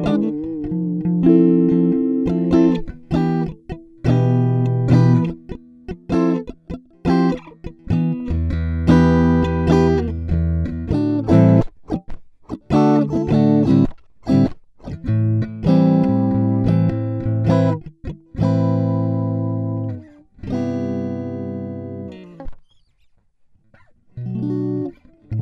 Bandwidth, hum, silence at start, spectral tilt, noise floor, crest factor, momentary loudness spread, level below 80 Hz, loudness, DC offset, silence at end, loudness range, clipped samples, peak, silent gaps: 7.2 kHz; none; 0 s; -9.5 dB/octave; -56 dBFS; 16 dB; 18 LU; -34 dBFS; -18 LUFS; under 0.1%; 0 s; 11 LU; under 0.1%; -2 dBFS; none